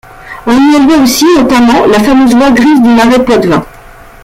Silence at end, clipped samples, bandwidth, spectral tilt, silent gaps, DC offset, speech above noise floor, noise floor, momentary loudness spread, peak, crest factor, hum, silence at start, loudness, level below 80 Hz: 0.55 s; under 0.1%; 16.5 kHz; -4.5 dB/octave; none; under 0.1%; 27 dB; -31 dBFS; 6 LU; 0 dBFS; 6 dB; none; 0.25 s; -6 LUFS; -32 dBFS